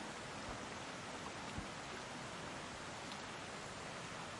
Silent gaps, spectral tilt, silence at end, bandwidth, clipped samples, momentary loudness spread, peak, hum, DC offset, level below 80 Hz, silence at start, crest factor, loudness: none; -3.5 dB/octave; 0 s; 11.5 kHz; under 0.1%; 1 LU; -32 dBFS; none; under 0.1%; -66 dBFS; 0 s; 16 dB; -47 LUFS